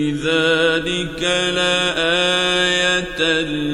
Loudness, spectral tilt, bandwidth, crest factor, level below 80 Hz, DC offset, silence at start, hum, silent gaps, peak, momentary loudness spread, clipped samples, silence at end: -17 LUFS; -3 dB/octave; 13.5 kHz; 14 dB; -42 dBFS; under 0.1%; 0 s; none; none; -4 dBFS; 4 LU; under 0.1%; 0 s